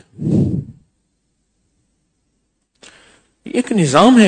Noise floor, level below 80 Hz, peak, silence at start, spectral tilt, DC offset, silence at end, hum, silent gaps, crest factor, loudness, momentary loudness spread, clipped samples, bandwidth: -67 dBFS; -48 dBFS; 0 dBFS; 0.2 s; -6 dB/octave; under 0.1%; 0 s; none; none; 18 dB; -16 LUFS; 22 LU; 0.2%; 9.4 kHz